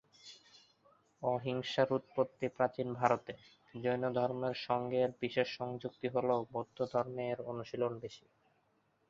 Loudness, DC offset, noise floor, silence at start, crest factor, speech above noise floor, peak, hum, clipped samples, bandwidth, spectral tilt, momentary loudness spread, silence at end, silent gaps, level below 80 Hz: -36 LUFS; under 0.1%; -76 dBFS; 0.25 s; 24 dB; 40 dB; -12 dBFS; none; under 0.1%; 7.6 kHz; -4.5 dB/octave; 12 LU; 0.9 s; none; -74 dBFS